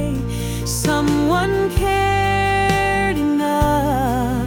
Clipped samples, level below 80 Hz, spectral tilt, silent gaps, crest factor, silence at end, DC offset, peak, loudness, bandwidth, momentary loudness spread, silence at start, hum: under 0.1%; -30 dBFS; -5.5 dB/octave; none; 14 dB; 0 s; under 0.1%; -4 dBFS; -18 LUFS; 18 kHz; 6 LU; 0 s; none